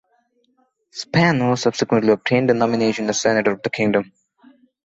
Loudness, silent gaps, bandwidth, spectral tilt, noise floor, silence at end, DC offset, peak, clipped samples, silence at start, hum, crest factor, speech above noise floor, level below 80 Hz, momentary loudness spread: -18 LUFS; none; 8 kHz; -5 dB/octave; -64 dBFS; 0.8 s; under 0.1%; -2 dBFS; under 0.1%; 0.95 s; none; 18 dB; 46 dB; -58 dBFS; 6 LU